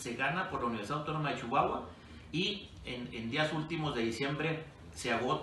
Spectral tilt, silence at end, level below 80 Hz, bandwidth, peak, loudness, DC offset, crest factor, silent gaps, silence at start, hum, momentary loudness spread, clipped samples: -5 dB/octave; 0 s; -58 dBFS; 12 kHz; -16 dBFS; -35 LUFS; under 0.1%; 20 dB; none; 0 s; none; 10 LU; under 0.1%